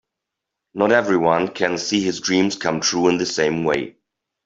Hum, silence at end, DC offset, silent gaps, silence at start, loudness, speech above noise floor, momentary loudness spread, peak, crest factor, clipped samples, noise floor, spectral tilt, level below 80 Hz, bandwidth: none; 0.55 s; under 0.1%; none; 0.75 s; -19 LUFS; 63 dB; 5 LU; -2 dBFS; 18 dB; under 0.1%; -82 dBFS; -4 dB/octave; -58 dBFS; 7.8 kHz